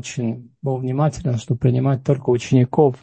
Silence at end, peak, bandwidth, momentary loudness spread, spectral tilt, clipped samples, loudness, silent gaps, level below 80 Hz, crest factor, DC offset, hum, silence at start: 0.05 s; -2 dBFS; 8.6 kHz; 9 LU; -8 dB/octave; under 0.1%; -20 LUFS; none; -48 dBFS; 18 dB; under 0.1%; none; 0.05 s